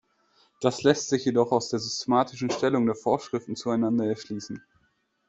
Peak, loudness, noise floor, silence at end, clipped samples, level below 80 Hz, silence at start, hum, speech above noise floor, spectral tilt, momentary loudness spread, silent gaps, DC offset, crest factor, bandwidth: -6 dBFS; -26 LUFS; -70 dBFS; 0.7 s; under 0.1%; -64 dBFS; 0.6 s; none; 45 dB; -5 dB/octave; 10 LU; none; under 0.1%; 22 dB; 8.2 kHz